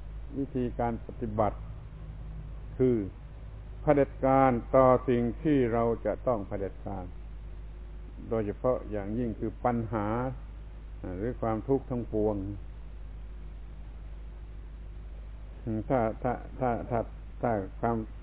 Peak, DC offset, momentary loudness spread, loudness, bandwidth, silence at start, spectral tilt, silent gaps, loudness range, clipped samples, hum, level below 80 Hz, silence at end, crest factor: -8 dBFS; under 0.1%; 20 LU; -30 LUFS; 4 kHz; 0 s; -8.5 dB/octave; none; 10 LU; under 0.1%; none; -42 dBFS; 0 s; 22 dB